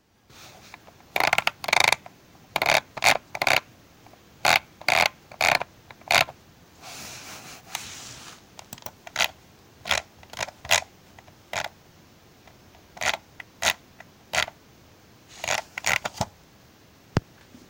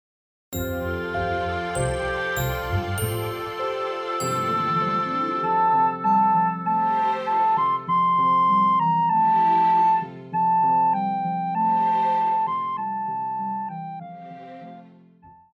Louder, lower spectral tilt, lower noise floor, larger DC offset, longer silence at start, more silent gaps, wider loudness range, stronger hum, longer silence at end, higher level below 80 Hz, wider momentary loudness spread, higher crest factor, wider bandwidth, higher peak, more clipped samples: about the same, -24 LUFS vs -22 LUFS; second, -1.5 dB/octave vs -5.5 dB/octave; about the same, -54 dBFS vs -51 dBFS; neither; about the same, 0.4 s vs 0.5 s; neither; about the same, 9 LU vs 7 LU; neither; first, 0.5 s vs 0.25 s; second, -56 dBFS vs -46 dBFS; first, 19 LU vs 11 LU; first, 28 dB vs 12 dB; about the same, 17 kHz vs 18 kHz; first, 0 dBFS vs -10 dBFS; neither